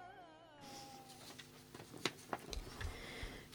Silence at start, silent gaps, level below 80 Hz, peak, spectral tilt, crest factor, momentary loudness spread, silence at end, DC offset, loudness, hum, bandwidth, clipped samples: 0 s; none; -58 dBFS; -20 dBFS; -3.5 dB/octave; 30 dB; 13 LU; 0 s; under 0.1%; -49 LUFS; none; over 20 kHz; under 0.1%